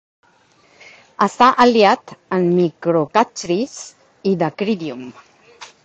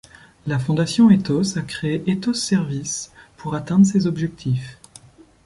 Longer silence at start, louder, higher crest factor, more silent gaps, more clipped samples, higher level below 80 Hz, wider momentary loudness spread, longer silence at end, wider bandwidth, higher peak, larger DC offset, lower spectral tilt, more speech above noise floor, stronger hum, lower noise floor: first, 1.2 s vs 0.45 s; first, -17 LUFS vs -20 LUFS; about the same, 18 dB vs 16 dB; neither; neither; second, -60 dBFS vs -52 dBFS; first, 17 LU vs 14 LU; second, 0.2 s vs 0.75 s; second, 8.6 kHz vs 11.5 kHz; first, 0 dBFS vs -4 dBFS; neither; about the same, -5.5 dB/octave vs -5.5 dB/octave; first, 38 dB vs 28 dB; neither; first, -55 dBFS vs -47 dBFS